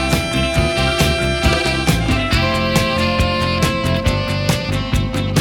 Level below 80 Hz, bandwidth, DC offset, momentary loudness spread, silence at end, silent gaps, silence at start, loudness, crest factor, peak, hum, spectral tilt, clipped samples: -26 dBFS; 19.5 kHz; under 0.1%; 3 LU; 0 s; none; 0 s; -17 LUFS; 16 dB; -2 dBFS; none; -5 dB/octave; under 0.1%